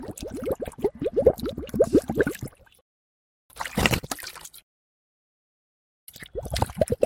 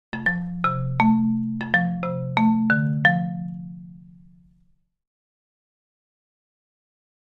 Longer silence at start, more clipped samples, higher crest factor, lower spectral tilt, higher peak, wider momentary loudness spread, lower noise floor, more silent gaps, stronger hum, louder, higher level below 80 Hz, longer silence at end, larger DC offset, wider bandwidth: second, 0 s vs 0.15 s; neither; first, 28 dB vs 22 dB; second, -5 dB/octave vs -8.5 dB/octave; about the same, 0 dBFS vs -2 dBFS; first, 18 LU vs 14 LU; first, under -90 dBFS vs -62 dBFS; first, 2.81-3.49 s, 4.63-6.07 s vs none; neither; second, -26 LUFS vs -22 LUFS; first, -44 dBFS vs -54 dBFS; second, 0 s vs 3.35 s; neither; first, 17 kHz vs 5.6 kHz